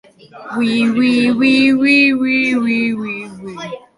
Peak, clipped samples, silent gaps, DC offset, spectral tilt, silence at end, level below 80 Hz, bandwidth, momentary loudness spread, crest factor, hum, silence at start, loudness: -2 dBFS; under 0.1%; none; under 0.1%; -5 dB/octave; 0.2 s; -56 dBFS; 11.5 kHz; 17 LU; 12 dB; none; 0.35 s; -13 LUFS